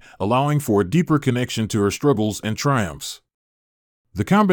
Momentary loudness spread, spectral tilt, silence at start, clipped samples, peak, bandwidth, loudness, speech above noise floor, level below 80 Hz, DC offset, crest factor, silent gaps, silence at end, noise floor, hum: 11 LU; -6 dB/octave; 0.2 s; under 0.1%; -4 dBFS; 19 kHz; -20 LUFS; over 71 dB; -54 dBFS; under 0.1%; 16 dB; 3.34-4.04 s; 0 s; under -90 dBFS; none